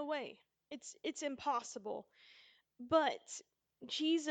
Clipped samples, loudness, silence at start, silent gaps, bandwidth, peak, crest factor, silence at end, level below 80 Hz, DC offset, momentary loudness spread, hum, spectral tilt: under 0.1%; -39 LUFS; 0 s; none; 9.2 kHz; -18 dBFS; 22 dB; 0 s; -82 dBFS; under 0.1%; 17 LU; none; -2.5 dB/octave